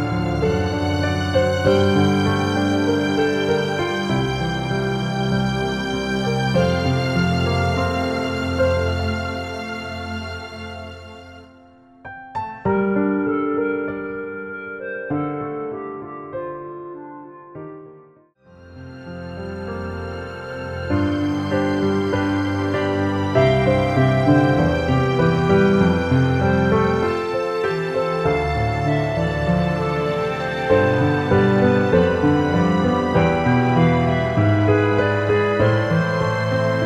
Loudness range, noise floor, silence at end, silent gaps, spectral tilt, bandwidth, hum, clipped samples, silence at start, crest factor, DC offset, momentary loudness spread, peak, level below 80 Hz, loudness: 13 LU; -51 dBFS; 0 s; none; -7 dB/octave; 13 kHz; none; under 0.1%; 0 s; 16 dB; under 0.1%; 15 LU; -4 dBFS; -40 dBFS; -20 LUFS